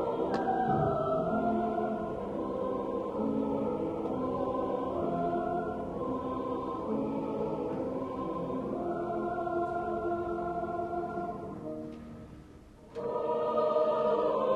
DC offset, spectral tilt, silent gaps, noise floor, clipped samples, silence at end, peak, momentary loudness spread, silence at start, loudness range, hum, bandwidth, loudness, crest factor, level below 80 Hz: under 0.1%; -8.5 dB/octave; none; -52 dBFS; under 0.1%; 0 s; -16 dBFS; 9 LU; 0 s; 4 LU; none; 11.5 kHz; -33 LUFS; 16 dB; -56 dBFS